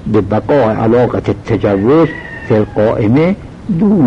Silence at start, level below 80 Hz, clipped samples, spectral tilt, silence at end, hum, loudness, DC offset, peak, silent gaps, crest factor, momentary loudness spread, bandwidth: 0 s; -36 dBFS; under 0.1%; -9.5 dB/octave; 0 s; none; -12 LUFS; under 0.1%; 0 dBFS; none; 10 dB; 6 LU; 8 kHz